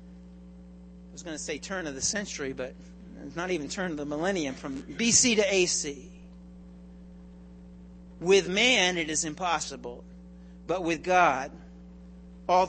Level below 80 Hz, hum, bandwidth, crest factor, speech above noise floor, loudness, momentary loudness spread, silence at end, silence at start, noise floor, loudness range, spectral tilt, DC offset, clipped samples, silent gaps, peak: -52 dBFS; none; 8.8 kHz; 22 dB; 20 dB; -27 LUFS; 22 LU; 0 s; 0 s; -48 dBFS; 7 LU; -2.5 dB/octave; under 0.1%; under 0.1%; none; -8 dBFS